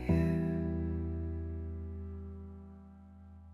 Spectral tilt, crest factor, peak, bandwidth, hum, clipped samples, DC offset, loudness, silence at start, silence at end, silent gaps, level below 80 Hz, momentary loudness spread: -10 dB/octave; 18 dB; -18 dBFS; 5.4 kHz; none; under 0.1%; under 0.1%; -37 LUFS; 0 s; 0 s; none; -48 dBFS; 23 LU